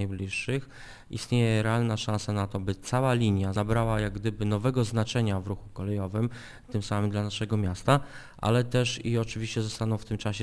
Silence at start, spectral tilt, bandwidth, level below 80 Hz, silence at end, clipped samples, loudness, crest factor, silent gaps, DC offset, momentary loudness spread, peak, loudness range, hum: 0 s; -6 dB/octave; 11 kHz; -48 dBFS; 0 s; under 0.1%; -29 LUFS; 22 dB; none; under 0.1%; 9 LU; -6 dBFS; 2 LU; none